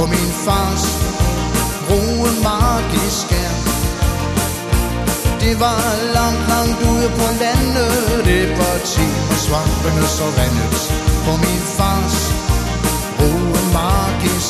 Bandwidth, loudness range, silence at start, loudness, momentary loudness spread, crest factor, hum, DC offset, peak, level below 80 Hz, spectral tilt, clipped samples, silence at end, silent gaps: 14 kHz; 2 LU; 0 s; -16 LUFS; 3 LU; 14 dB; none; under 0.1%; -2 dBFS; -22 dBFS; -4.5 dB/octave; under 0.1%; 0 s; none